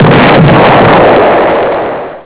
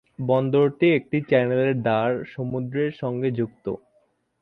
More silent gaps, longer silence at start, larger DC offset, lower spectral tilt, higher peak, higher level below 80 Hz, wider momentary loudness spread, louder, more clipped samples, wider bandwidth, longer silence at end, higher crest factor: neither; second, 0 s vs 0.2 s; neither; about the same, -10.5 dB/octave vs -10 dB/octave; first, 0 dBFS vs -6 dBFS; first, -30 dBFS vs -62 dBFS; about the same, 8 LU vs 10 LU; first, -5 LUFS vs -23 LUFS; neither; second, 4 kHz vs 5 kHz; second, 0.05 s vs 0.65 s; second, 4 dB vs 18 dB